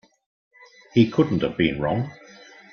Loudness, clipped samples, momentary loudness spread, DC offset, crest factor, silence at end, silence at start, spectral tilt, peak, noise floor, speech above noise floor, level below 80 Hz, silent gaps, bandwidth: -22 LUFS; under 0.1%; 8 LU; under 0.1%; 20 dB; 0.6 s; 0.95 s; -8 dB/octave; -4 dBFS; -47 dBFS; 26 dB; -52 dBFS; none; 6.8 kHz